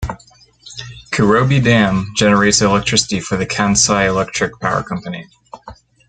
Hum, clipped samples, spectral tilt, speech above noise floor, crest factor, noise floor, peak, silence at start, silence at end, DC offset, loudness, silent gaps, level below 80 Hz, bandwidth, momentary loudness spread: none; under 0.1%; -4 dB/octave; 33 dB; 16 dB; -48 dBFS; 0 dBFS; 0 s; 0.35 s; under 0.1%; -14 LUFS; none; -38 dBFS; 9.4 kHz; 19 LU